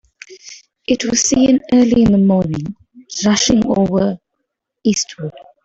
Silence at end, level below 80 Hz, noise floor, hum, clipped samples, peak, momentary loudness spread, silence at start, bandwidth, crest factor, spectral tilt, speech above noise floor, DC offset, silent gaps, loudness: 0.25 s; -42 dBFS; -74 dBFS; none; under 0.1%; -2 dBFS; 18 LU; 0.3 s; 8.2 kHz; 14 dB; -4.5 dB/octave; 60 dB; under 0.1%; none; -15 LUFS